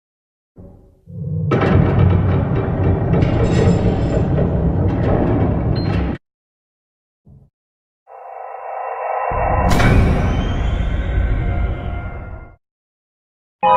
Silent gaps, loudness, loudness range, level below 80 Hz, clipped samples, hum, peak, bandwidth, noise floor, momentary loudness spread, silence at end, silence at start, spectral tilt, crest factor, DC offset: 6.34-7.24 s, 7.53-8.06 s, 12.71-13.59 s; -18 LUFS; 9 LU; -24 dBFS; under 0.1%; none; 0 dBFS; 11 kHz; -42 dBFS; 16 LU; 0 s; 0.6 s; -8 dB/octave; 16 dB; under 0.1%